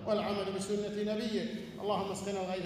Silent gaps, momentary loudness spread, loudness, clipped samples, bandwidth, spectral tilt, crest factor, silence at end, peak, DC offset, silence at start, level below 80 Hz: none; 4 LU; -35 LUFS; under 0.1%; 15.5 kHz; -5 dB/octave; 14 dB; 0 s; -20 dBFS; under 0.1%; 0 s; -64 dBFS